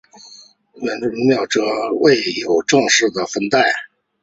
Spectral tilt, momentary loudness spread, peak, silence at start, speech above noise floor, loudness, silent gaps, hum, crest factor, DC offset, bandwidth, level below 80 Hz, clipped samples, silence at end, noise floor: -3 dB/octave; 9 LU; -2 dBFS; 0.25 s; 28 dB; -16 LUFS; none; none; 16 dB; under 0.1%; 8 kHz; -60 dBFS; under 0.1%; 0.4 s; -45 dBFS